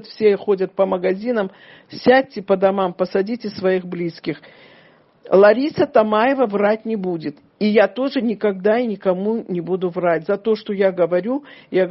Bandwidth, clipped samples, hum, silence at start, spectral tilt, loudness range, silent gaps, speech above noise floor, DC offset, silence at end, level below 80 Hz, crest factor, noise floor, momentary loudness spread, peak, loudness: 6 kHz; under 0.1%; none; 0.05 s; -5 dB/octave; 3 LU; none; 33 dB; under 0.1%; 0 s; -64 dBFS; 18 dB; -51 dBFS; 10 LU; 0 dBFS; -19 LUFS